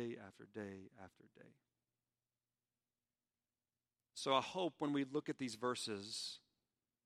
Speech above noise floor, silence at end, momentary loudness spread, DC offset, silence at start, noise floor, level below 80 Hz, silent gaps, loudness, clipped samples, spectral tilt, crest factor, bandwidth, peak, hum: over 46 dB; 0.65 s; 19 LU; under 0.1%; 0 s; under -90 dBFS; -90 dBFS; none; -43 LUFS; under 0.1%; -4 dB/octave; 26 dB; 14 kHz; -20 dBFS; none